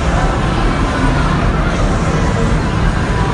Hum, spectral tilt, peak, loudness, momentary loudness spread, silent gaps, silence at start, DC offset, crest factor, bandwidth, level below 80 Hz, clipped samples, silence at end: none; -6 dB/octave; 0 dBFS; -15 LUFS; 1 LU; none; 0 s; under 0.1%; 12 dB; 11 kHz; -18 dBFS; under 0.1%; 0 s